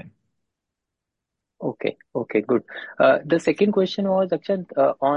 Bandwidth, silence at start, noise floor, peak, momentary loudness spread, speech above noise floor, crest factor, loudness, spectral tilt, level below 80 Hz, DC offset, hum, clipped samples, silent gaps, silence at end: 9.4 kHz; 0.05 s; -84 dBFS; -6 dBFS; 12 LU; 62 dB; 16 dB; -22 LUFS; -6.5 dB/octave; -66 dBFS; under 0.1%; none; under 0.1%; none; 0 s